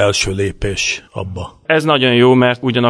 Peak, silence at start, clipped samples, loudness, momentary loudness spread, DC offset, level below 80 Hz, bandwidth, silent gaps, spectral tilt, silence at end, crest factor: 0 dBFS; 0 s; under 0.1%; -14 LUFS; 16 LU; under 0.1%; -36 dBFS; 11 kHz; none; -4.5 dB/octave; 0 s; 14 dB